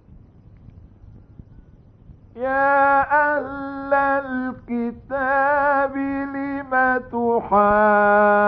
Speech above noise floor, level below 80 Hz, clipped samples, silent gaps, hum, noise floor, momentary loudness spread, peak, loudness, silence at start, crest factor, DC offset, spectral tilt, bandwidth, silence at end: 29 dB; -48 dBFS; under 0.1%; none; none; -48 dBFS; 12 LU; -4 dBFS; -19 LUFS; 1.15 s; 16 dB; under 0.1%; -10 dB/octave; 5.4 kHz; 0 s